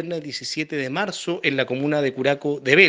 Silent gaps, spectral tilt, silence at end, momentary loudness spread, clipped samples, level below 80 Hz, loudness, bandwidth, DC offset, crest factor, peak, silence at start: none; -4.5 dB/octave; 0 s; 6 LU; under 0.1%; -68 dBFS; -23 LUFS; 9.6 kHz; under 0.1%; 22 dB; 0 dBFS; 0 s